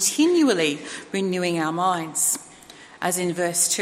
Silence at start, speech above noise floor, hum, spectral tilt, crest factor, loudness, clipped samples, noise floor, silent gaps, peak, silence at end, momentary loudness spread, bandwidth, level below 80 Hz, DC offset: 0 s; 24 dB; none; -3 dB/octave; 16 dB; -22 LUFS; under 0.1%; -46 dBFS; none; -6 dBFS; 0 s; 10 LU; 16 kHz; -70 dBFS; under 0.1%